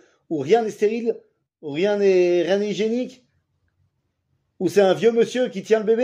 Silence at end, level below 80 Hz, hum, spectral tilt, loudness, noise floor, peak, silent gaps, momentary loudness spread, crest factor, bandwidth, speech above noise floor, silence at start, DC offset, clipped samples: 0 s; -74 dBFS; none; -5.5 dB/octave; -21 LUFS; -71 dBFS; -4 dBFS; none; 12 LU; 16 dB; 15 kHz; 52 dB; 0.3 s; under 0.1%; under 0.1%